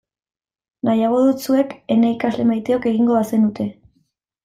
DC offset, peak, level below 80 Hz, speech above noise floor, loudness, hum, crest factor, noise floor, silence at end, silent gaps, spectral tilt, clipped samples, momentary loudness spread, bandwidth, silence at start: under 0.1%; -6 dBFS; -58 dBFS; 49 dB; -18 LUFS; none; 14 dB; -66 dBFS; 0.7 s; none; -7 dB/octave; under 0.1%; 4 LU; 14.5 kHz; 0.85 s